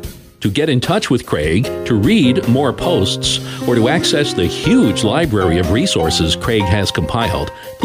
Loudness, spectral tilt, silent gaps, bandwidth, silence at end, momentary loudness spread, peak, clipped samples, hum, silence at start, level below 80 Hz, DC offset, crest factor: -15 LUFS; -5 dB/octave; none; 16 kHz; 0 s; 5 LU; -2 dBFS; under 0.1%; none; 0 s; -34 dBFS; under 0.1%; 14 dB